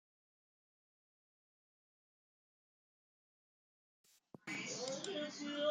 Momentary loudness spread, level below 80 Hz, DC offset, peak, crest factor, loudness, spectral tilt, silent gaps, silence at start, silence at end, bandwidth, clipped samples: 11 LU; under -90 dBFS; under 0.1%; -26 dBFS; 24 dB; -43 LUFS; -2.5 dB/octave; none; 4.45 s; 0 s; 11.5 kHz; under 0.1%